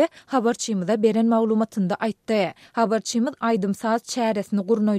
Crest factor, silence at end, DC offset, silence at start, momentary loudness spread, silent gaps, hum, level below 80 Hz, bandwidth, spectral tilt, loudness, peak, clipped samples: 14 dB; 0 s; under 0.1%; 0 s; 5 LU; none; none; -70 dBFS; 13.5 kHz; -5.5 dB/octave; -23 LUFS; -8 dBFS; under 0.1%